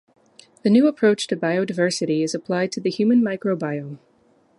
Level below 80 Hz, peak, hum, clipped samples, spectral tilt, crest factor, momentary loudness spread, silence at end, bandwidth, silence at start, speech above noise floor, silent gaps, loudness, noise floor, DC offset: -70 dBFS; -6 dBFS; none; under 0.1%; -5.5 dB/octave; 16 dB; 9 LU; 0.6 s; 11.5 kHz; 0.65 s; 39 dB; none; -21 LUFS; -59 dBFS; under 0.1%